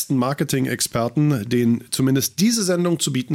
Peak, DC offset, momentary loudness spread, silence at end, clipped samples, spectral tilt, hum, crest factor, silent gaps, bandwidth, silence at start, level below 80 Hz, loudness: -8 dBFS; under 0.1%; 3 LU; 0 s; under 0.1%; -5 dB/octave; none; 12 dB; none; 17 kHz; 0 s; -56 dBFS; -20 LUFS